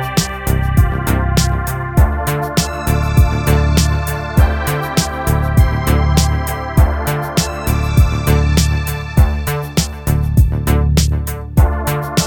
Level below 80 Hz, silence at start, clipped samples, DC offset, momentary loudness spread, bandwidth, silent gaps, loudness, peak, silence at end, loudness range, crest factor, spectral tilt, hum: -18 dBFS; 0 s; under 0.1%; under 0.1%; 4 LU; 19 kHz; none; -15 LUFS; 0 dBFS; 0 s; 1 LU; 14 dB; -5.5 dB/octave; none